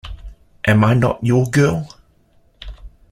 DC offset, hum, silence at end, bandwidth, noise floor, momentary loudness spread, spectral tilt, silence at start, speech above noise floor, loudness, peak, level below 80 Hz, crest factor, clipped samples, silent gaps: under 0.1%; none; 0.25 s; 14.5 kHz; -55 dBFS; 24 LU; -7 dB/octave; 0.05 s; 40 dB; -16 LUFS; -2 dBFS; -38 dBFS; 16 dB; under 0.1%; none